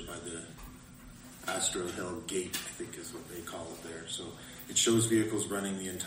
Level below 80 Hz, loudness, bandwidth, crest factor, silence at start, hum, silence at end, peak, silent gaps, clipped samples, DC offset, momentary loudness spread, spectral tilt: -60 dBFS; -34 LUFS; 16 kHz; 20 dB; 0 s; none; 0 s; -16 dBFS; none; under 0.1%; under 0.1%; 21 LU; -3 dB/octave